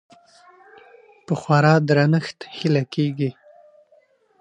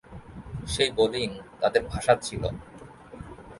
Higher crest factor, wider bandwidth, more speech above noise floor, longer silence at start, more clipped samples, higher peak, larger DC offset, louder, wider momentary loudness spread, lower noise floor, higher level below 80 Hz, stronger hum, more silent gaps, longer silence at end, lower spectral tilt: about the same, 20 dB vs 22 dB; second, 9 kHz vs 11.5 kHz; first, 39 dB vs 20 dB; first, 1.3 s vs 0.1 s; neither; first, -2 dBFS vs -6 dBFS; neither; first, -20 LUFS vs -26 LUFS; second, 12 LU vs 21 LU; first, -58 dBFS vs -46 dBFS; second, -68 dBFS vs -46 dBFS; neither; neither; first, 1.1 s vs 0 s; first, -7.5 dB/octave vs -4 dB/octave